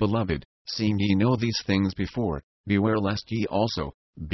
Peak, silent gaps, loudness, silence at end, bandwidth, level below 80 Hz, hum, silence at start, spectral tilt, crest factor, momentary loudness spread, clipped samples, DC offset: -10 dBFS; 0.45-0.65 s, 2.43-2.64 s, 3.94-4.13 s; -26 LUFS; 0 s; 6.2 kHz; -44 dBFS; none; 0 s; -6.5 dB/octave; 16 dB; 10 LU; under 0.1%; under 0.1%